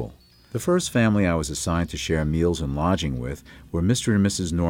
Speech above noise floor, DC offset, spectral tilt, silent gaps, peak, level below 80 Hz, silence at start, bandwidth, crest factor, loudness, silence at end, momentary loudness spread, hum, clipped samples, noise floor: 21 dB; under 0.1%; -5.5 dB/octave; none; -8 dBFS; -38 dBFS; 0 s; 16.5 kHz; 14 dB; -23 LUFS; 0 s; 11 LU; none; under 0.1%; -43 dBFS